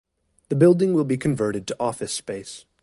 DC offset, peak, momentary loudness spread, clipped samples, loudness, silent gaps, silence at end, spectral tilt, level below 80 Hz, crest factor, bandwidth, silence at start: under 0.1%; -4 dBFS; 15 LU; under 0.1%; -22 LUFS; none; 0.25 s; -6.5 dB/octave; -58 dBFS; 18 dB; 11.5 kHz; 0.5 s